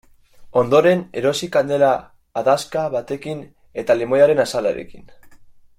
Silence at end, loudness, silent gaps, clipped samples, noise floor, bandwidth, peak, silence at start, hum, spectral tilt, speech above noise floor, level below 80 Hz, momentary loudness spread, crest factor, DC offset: 0.35 s; -18 LUFS; none; under 0.1%; -45 dBFS; 15 kHz; -2 dBFS; 0.4 s; none; -5 dB/octave; 27 dB; -54 dBFS; 14 LU; 16 dB; under 0.1%